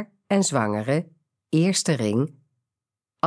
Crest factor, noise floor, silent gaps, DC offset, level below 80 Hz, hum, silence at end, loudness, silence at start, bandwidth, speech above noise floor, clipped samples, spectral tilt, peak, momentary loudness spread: 18 dB; -89 dBFS; none; under 0.1%; -72 dBFS; none; 0 s; -23 LUFS; 0 s; 11 kHz; 67 dB; under 0.1%; -5 dB/octave; -6 dBFS; 6 LU